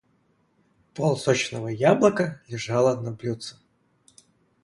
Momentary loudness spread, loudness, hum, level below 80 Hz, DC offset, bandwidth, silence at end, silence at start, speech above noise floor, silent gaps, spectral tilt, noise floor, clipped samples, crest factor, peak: 15 LU; -24 LUFS; none; -64 dBFS; under 0.1%; 11.5 kHz; 1.1 s; 0.95 s; 43 dB; none; -5.5 dB/octave; -66 dBFS; under 0.1%; 20 dB; -4 dBFS